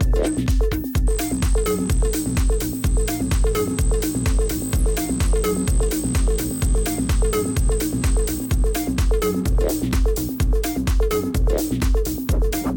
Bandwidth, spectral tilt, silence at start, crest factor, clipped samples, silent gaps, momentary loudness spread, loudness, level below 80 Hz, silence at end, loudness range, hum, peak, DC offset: 17 kHz; -5.5 dB/octave; 0 s; 8 dB; under 0.1%; none; 2 LU; -22 LUFS; -22 dBFS; 0 s; 0 LU; none; -10 dBFS; under 0.1%